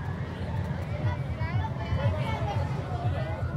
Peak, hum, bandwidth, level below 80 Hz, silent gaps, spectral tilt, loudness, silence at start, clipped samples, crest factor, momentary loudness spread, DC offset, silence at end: -16 dBFS; none; 9.8 kHz; -42 dBFS; none; -8 dB/octave; -31 LUFS; 0 s; under 0.1%; 14 dB; 4 LU; under 0.1%; 0 s